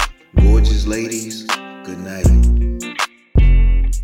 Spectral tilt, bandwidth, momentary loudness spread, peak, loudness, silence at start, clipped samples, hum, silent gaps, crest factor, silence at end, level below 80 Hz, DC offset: -5.5 dB/octave; 14 kHz; 10 LU; -4 dBFS; -17 LUFS; 0 s; under 0.1%; none; none; 10 dB; 0 s; -14 dBFS; under 0.1%